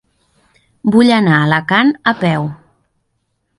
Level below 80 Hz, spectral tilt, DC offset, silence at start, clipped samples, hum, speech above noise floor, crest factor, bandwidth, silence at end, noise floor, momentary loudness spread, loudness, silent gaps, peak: -54 dBFS; -7 dB/octave; under 0.1%; 0.85 s; under 0.1%; none; 55 dB; 16 dB; 11.5 kHz; 1.05 s; -67 dBFS; 10 LU; -13 LUFS; none; 0 dBFS